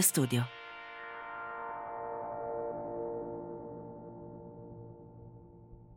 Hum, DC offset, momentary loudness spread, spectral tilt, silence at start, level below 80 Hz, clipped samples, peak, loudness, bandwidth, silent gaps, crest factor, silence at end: none; under 0.1%; 18 LU; -4 dB/octave; 0 s; -66 dBFS; under 0.1%; -12 dBFS; -39 LUFS; 16 kHz; none; 26 dB; 0 s